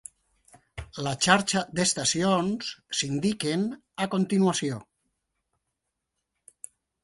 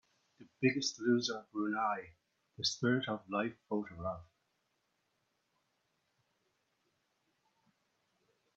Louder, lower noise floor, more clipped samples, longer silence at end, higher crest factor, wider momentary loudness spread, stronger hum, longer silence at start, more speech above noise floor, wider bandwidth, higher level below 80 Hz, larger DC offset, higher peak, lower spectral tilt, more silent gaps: first, -26 LUFS vs -36 LUFS; about the same, -82 dBFS vs -81 dBFS; neither; second, 2.2 s vs 4.35 s; about the same, 22 dB vs 24 dB; first, 23 LU vs 10 LU; neither; first, 0.75 s vs 0.4 s; first, 56 dB vs 46 dB; first, 11.5 kHz vs 7.8 kHz; first, -58 dBFS vs -76 dBFS; neither; first, -6 dBFS vs -16 dBFS; about the same, -3.5 dB/octave vs -3.5 dB/octave; neither